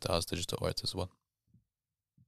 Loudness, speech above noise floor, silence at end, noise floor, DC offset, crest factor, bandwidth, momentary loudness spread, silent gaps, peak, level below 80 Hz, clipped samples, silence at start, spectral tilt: -36 LUFS; over 54 dB; 0 s; under -90 dBFS; under 0.1%; 26 dB; 15 kHz; 8 LU; none; -12 dBFS; -56 dBFS; under 0.1%; 0 s; -4 dB/octave